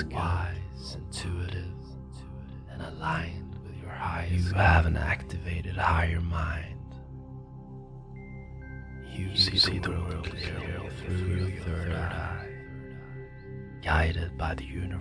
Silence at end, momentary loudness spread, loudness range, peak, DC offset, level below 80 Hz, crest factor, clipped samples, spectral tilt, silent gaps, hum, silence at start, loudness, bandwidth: 0 s; 20 LU; 8 LU; -8 dBFS; under 0.1%; -38 dBFS; 24 dB; under 0.1%; -5.5 dB/octave; none; none; 0 s; -30 LUFS; 10.5 kHz